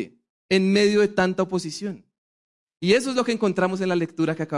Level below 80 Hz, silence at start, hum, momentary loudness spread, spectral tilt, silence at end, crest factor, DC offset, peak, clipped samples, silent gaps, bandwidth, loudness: -62 dBFS; 0 s; none; 13 LU; -5.5 dB/octave; 0 s; 16 dB; under 0.1%; -6 dBFS; under 0.1%; 0.29-0.49 s, 2.18-2.67 s; 11.5 kHz; -22 LUFS